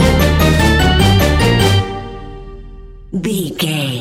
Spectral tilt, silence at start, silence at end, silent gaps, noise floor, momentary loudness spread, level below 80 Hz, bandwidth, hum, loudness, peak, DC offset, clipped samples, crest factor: -5.5 dB/octave; 0 s; 0 s; none; -33 dBFS; 18 LU; -20 dBFS; 16.5 kHz; none; -13 LUFS; 0 dBFS; under 0.1%; under 0.1%; 12 dB